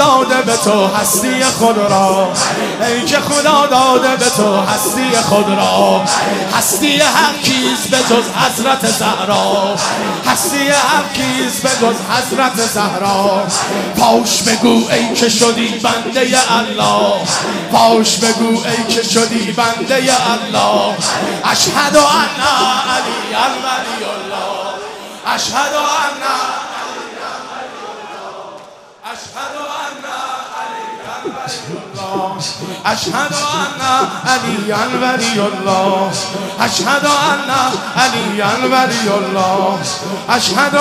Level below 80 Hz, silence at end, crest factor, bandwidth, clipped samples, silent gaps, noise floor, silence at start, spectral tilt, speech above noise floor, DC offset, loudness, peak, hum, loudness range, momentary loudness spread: -52 dBFS; 0 s; 14 dB; 16 kHz; under 0.1%; none; -36 dBFS; 0 s; -2.5 dB/octave; 23 dB; under 0.1%; -13 LUFS; 0 dBFS; none; 10 LU; 13 LU